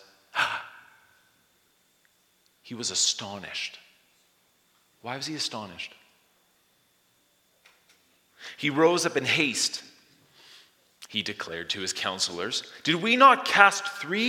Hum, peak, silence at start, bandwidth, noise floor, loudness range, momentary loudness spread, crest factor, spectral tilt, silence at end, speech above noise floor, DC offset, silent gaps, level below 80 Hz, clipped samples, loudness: none; 0 dBFS; 0.35 s; 17.5 kHz; -67 dBFS; 14 LU; 20 LU; 28 dB; -2 dB/octave; 0 s; 41 dB; under 0.1%; none; -76 dBFS; under 0.1%; -25 LUFS